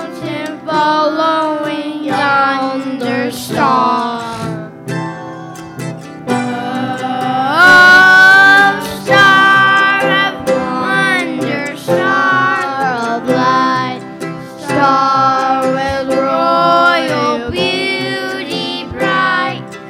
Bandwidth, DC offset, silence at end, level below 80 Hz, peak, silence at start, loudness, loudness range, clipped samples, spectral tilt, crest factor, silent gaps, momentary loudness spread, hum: 16.5 kHz; under 0.1%; 0 s; -48 dBFS; 0 dBFS; 0 s; -11 LUFS; 11 LU; under 0.1%; -4 dB/octave; 12 dB; none; 16 LU; none